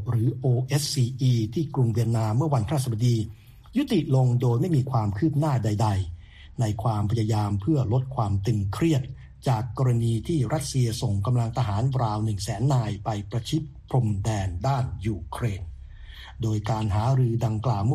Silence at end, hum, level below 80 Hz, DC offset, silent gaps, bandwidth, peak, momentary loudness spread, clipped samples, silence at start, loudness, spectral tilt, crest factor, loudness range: 0 s; none; -46 dBFS; under 0.1%; none; 13.5 kHz; -10 dBFS; 7 LU; under 0.1%; 0 s; -25 LUFS; -7 dB/octave; 14 dB; 3 LU